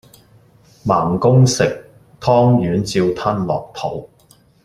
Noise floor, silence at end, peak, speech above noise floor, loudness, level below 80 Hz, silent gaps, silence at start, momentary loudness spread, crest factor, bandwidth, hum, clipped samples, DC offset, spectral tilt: -52 dBFS; 0.6 s; -2 dBFS; 36 dB; -16 LUFS; -48 dBFS; none; 0.85 s; 13 LU; 16 dB; 12.5 kHz; none; under 0.1%; under 0.1%; -6.5 dB/octave